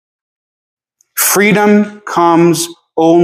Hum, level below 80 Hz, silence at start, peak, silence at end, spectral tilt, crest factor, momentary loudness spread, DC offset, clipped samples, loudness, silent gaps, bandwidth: none; -62 dBFS; 1.15 s; 0 dBFS; 0 s; -4.5 dB/octave; 12 dB; 8 LU; under 0.1%; under 0.1%; -11 LUFS; none; 16 kHz